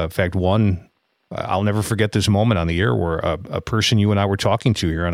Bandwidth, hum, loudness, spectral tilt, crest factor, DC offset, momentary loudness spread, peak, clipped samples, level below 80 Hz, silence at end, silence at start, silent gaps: 15 kHz; none; -19 LUFS; -6 dB/octave; 16 dB; under 0.1%; 7 LU; -2 dBFS; under 0.1%; -38 dBFS; 0 s; 0 s; none